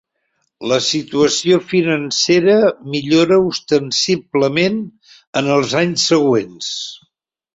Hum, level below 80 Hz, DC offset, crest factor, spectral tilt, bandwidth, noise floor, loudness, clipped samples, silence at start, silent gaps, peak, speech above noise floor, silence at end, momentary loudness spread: none; -58 dBFS; under 0.1%; 16 dB; -4 dB/octave; 8 kHz; -71 dBFS; -15 LUFS; under 0.1%; 0.6 s; 5.27-5.33 s; 0 dBFS; 56 dB; 0.6 s; 11 LU